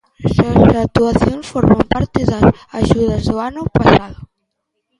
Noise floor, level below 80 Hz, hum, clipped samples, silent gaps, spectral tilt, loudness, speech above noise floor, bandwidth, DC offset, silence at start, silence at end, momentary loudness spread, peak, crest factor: -72 dBFS; -30 dBFS; none; under 0.1%; none; -7.5 dB/octave; -14 LUFS; 59 dB; 11 kHz; under 0.1%; 0.2 s; 0.75 s; 8 LU; 0 dBFS; 14 dB